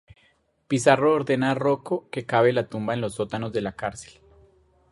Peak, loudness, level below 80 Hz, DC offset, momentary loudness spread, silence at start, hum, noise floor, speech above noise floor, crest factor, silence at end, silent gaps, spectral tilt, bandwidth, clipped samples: -2 dBFS; -24 LUFS; -58 dBFS; under 0.1%; 10 LU; 0.7 s; none; -65 dBFS; 41 dB; 22 dB; 0.9 s; none; -5.5 dB/octave; 11.5 kHz; under 0.1%